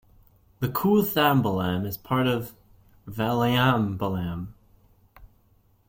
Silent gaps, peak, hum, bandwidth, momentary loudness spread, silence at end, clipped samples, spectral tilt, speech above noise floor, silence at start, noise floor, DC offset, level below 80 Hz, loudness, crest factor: none; -6 dBFS; none; 16.5 kHz; 13 LU; 0.65 s; under 0.1%; -6.5 dB/octave; 38 dB; 0.6 s; -62 dBFS; under 0.1%; -54 dBFS; -24 LUFS; 20 dB